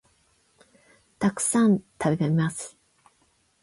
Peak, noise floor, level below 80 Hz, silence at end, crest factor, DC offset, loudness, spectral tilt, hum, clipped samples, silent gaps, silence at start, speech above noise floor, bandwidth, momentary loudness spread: -10 dBFS; -66 dBFS; -62 dBFS; 0.95 s; 16 dB; under 0.1%; -24 LUFS; -5.5 dB/octave; none; under 0.1%; none; 1.2 s; 43 dB; 11.5 kHz; 11 LU